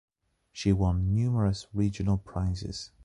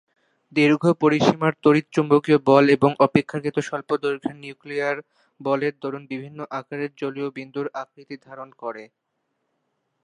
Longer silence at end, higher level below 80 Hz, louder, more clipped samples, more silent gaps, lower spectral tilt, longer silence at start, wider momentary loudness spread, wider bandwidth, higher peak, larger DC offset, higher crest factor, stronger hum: second, 0.2 s vs 1.2 s; first, -40 dBFS vs -64 dBFS; second, -29 LUFS vs -21 LUFS; neither; neither; about the same, -7 dB/octave vs -7 dB/octave; about the same, 0.55 s vs 0.55 s; second, 8 LU vs 17 LU; about the same, 10.5 kHz vs 10.5 kHz; second, -12 dBFS vs -2 dBFS; neither; about the same, 16 dB vs 20 dB; neither